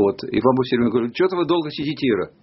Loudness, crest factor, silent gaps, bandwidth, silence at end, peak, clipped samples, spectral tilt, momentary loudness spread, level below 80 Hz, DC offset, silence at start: -20 LUFS; 18 dB; none; 6 kHz; 0.15 s; -2 dBFS; under 0.1%; -5 dB/octave; 3 LU; -54 dBFS; under 0.1%; 0 s